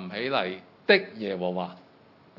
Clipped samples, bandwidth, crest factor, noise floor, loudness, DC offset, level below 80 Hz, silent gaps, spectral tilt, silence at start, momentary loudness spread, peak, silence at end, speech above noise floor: under 0.1%; 5.8 kHz; 24 dB; -56 dBFS; -27 LUFS; under 0.1%; -82 dBFS; none; -7 dB/octave; 0 s; 12 LU; -4 dBFS; 0.6 s; 29 dB